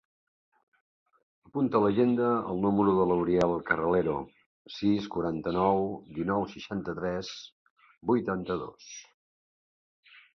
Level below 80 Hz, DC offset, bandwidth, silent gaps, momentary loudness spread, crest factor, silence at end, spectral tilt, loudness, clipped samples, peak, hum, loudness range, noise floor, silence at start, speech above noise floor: -58 dBFS; under 0.1%; 7.4 kHz; 4.46-4.65 s, 7.52-7.76 s; 15 LU; 20 dB; 1.35 s; -7 dB/octave; -28 LUFS; under 0.1%; -10 dBFS; none; 8 LU; under -90 dBFS; 1.55 s; over 62 dB